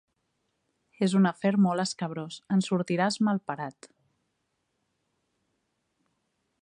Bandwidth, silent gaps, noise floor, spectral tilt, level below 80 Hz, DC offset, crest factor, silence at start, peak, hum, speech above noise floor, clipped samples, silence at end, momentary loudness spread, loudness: 10 kHz; none; -78 dBFS; -6 dB/octave; -78 dBFS; under 0.1%; 18 dB; 1 s; -12 dBFS; none; 52 dB; under 0.1%; 2.75 s; 12 LU; -27 LUFS